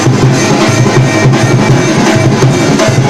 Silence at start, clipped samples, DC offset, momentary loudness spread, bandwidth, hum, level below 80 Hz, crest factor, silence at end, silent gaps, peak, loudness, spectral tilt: 0 s; under 0.1%; under 0.1%; 1 LU; 13.5 kHz; none; -32 dBFS; 6 dB; 0 s; none; 0 dBFS; -7 LUFS; -5.5 dB/octave